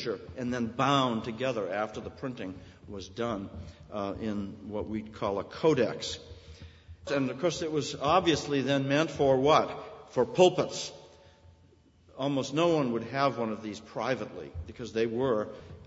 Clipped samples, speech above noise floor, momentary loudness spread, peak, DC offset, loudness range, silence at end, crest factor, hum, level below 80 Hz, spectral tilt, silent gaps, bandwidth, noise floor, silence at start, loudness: under 0.1%; 31 dB; 17 LU; -8 dBFS; under 0.1%; 9 LU; 0 s; 22 dB; none; -58 dBFS; -5.5 dB/octave; none; 8 kHz; -61 dBFS; 0 s; -30 LUFS